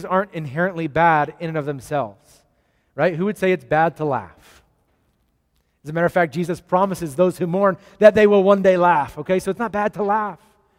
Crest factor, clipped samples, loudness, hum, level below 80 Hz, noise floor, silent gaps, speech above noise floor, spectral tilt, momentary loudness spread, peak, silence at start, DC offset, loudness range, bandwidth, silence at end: 20 dB; under 0.1%; -19 LUFS; none; -54 dBFS; -66 dBFS; none; 47 dB; -7 dB/octave; 12 LU; 0 dBFS; 0 s; under 0.1%; 7 LU; 16 kHz; 0.45 s